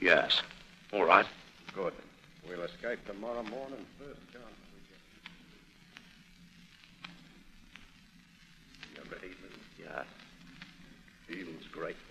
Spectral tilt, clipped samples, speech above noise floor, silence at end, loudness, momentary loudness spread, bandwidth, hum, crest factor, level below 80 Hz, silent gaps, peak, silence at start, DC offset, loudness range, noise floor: -4 dB/octave; under 0.1%; 27 dB; 0 s; -33 LUFS; 30 LU; 13.5 kHz; none; 32 dB; -64 dBFS; none; -6 dBFS; 0 s; under 0.1%; 21 LU; -60 dBFS